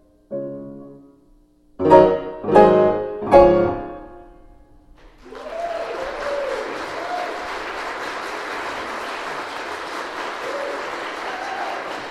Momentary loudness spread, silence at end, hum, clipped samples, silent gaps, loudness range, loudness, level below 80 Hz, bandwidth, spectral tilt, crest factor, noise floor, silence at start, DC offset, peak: 18 LU; 0 s; none; under 0.1%; none; 12 LU; -20 LUFS; -44 dBFS; 12.5 kHz; -6 dB/octave; 20 dB; -54 dBFS; 0.3 s; under 0.1%; 0 dBFS